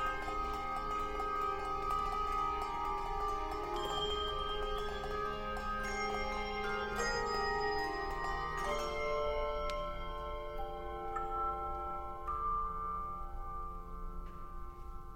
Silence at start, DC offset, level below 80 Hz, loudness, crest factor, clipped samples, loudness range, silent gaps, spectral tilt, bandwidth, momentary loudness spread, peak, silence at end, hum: 0 s; under 0.1%; -46 dBFS; -38 LUFS; 16 dB; under 0.1%; 3 LU; none; -4 dB/octave; 16 kHz; 10 LU; -22 dBFS; 0 s; none